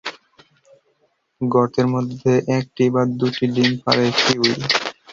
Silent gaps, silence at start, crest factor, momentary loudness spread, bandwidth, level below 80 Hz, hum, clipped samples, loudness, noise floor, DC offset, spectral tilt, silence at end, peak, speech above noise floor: none; 0.05 s; 18 dB; 4 LU; 7.6 kHz; -56 dBFS; none; under 0.1%; -18 LUFS; -65 dBFS; under 0.1%; -5 dB/octave; 0.2 s; -2 dBFS; 47 dB